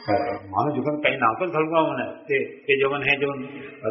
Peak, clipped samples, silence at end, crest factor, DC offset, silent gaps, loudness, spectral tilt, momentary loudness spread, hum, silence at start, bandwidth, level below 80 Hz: -4 dBFS; under 0.1%; 0 s; 20 dB; under 0.1%; none; -23 LUFS; -3 dB/octave; 8 LU; none; 0 s; 5.8 kHz; -62 dBFS